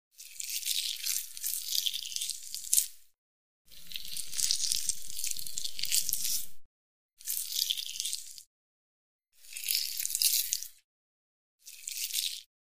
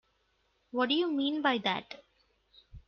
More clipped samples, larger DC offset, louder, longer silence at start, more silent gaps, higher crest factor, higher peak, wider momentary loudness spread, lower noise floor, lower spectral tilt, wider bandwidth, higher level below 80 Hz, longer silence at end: neither; neither; about the same, -31 LUFS vs -31 LUFS; second, 0.1 s vs 0.75 s; first, 3.18-3.65 s, 6.65-7.17 s, 8.47-9.19 s, 10.84-11.58 s vs none; first, 34 dB vs 20 dB; first, -2 dBFS vs -14 dBFS; about the same, 15 LU vs 15 LU; first, under -90 dBFS vs -74 dBFS; second, 3.5 dB/octave vs -5.5 dB/octave; first, 16 kHz vs 6.6 kHz; about the same, -64 dBFS vs -64 dBFS; about the same, 0.2 s vs 0.1 s